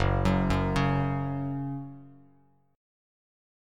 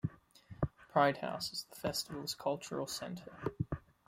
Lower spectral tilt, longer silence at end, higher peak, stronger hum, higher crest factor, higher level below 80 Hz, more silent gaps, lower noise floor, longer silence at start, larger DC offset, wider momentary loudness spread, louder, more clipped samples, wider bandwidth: first, -7.5 dB/octave vs -4.5 dB/octave; first, 1.6 s vs 0.3 s; first, -12 dBFS vs -18 dBFS; neither; about the same, 18 dB vs 22 dB; first, -40 dBFS vs -58 dBFS; neither; first, -63 dBFS vs -57 dBFS; about the same, 0 s vs 0.05 s; neither; about the same, 14 LU vs 12 LU; first, -29 LUFS vs -38 LUFS; neither; second, 11 kHz vs 16.5 kHz